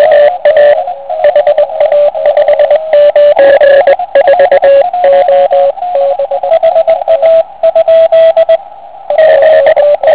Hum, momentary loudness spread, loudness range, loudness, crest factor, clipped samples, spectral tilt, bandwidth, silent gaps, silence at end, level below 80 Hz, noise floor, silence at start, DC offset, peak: none; 6 LU; 2 LU; -6 LUFS; 6 dB; 4%; -6 dB/octave; 4 kHz; none; 0 s; -48 dBFS; -28 dBFS; 0 s; 1%; 0 dBFS